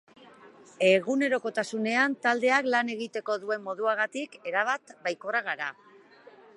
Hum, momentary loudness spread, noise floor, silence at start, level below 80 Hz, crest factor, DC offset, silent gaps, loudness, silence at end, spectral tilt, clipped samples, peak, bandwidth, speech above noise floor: none; 10 LU; -54 dBFS; 0.2 s; -84 dBFS; 20 dB; under 0.1%; none; -27 LUFS; 0.85 s; -4 dB/octave; under 0.1%; -8 dBFS; 11.5 kHz; 26 dB